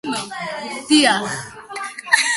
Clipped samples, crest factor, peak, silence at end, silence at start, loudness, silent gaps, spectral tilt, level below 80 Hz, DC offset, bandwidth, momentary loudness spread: under 0.1%; 20 dB; 0 dBFS; 0 s; 0.05 s; -19 LUFS; none; -2 dB/octave; -62 dBFS; under 0.1%; 12 kHz; 15 LU